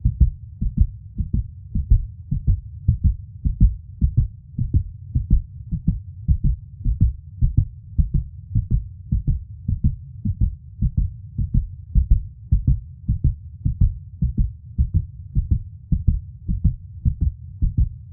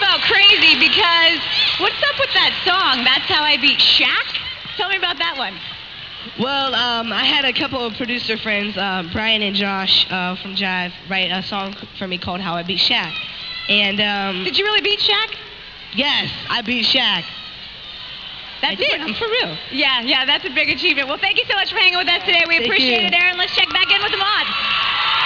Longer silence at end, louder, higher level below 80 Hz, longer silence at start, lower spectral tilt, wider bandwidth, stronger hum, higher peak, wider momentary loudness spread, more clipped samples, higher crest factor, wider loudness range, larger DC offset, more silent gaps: about the same, 0 s vs 0 s; second, -24 LUFS vs -15 LUFS; first, -24 dBFS vs -50 dBFS; about the same, 0.05 s vs 0 s; first, -16 dB/octave vs -3.5 dB/octave; second, 0.7 kHz vs 5.4 kHz; neither; about the same, -2 dBFS vs -2 dBFS; second, 7 LU vs 14 LU; neither; about the same, 18 dB vs 16 dB; second, 2 LU vs 6 LU; second, under 0.1% vs 0.1%; neither